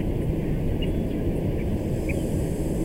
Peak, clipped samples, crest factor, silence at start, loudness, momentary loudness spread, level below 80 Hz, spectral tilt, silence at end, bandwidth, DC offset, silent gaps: -12 dBFS; under 0.1%; 12 dB; 0 s; -27 LUFS; 1 LU; -30 dBFS; -7.5 dB/octave; 0 s; 16 kHz; under 0.1%; none